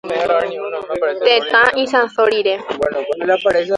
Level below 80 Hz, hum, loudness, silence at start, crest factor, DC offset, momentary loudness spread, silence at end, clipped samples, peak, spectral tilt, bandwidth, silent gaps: -54 dBFS; none; -16 LUFS; 0.05 s; 16 dB; under 0.1%; 8 LU; 0 s; under 0.1%; 0 dBFS; -3.5 dB/octave; 11 kHz; none